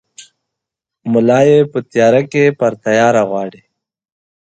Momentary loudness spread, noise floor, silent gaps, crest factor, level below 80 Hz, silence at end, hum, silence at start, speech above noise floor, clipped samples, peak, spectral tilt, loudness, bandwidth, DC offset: 10 LU; -82 dBFS; none; 14 dB; -60 dBFS; 1 s; none; 0.2 s; 70 dB; under 0.1%; 0 dBFS; -6.5 dB/octave; -13 LUFS; 9 kHz; under 0.1%